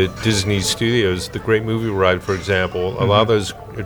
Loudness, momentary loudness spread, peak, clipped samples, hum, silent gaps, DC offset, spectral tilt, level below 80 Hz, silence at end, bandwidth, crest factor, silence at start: -18 LUFS; 5 LU; 0 dBFS; under 0.1%; none; none; under 0.1%; -5 dB/octave; -40 dBFS; 0 s; over 20 kHz; 18 dB; 0 s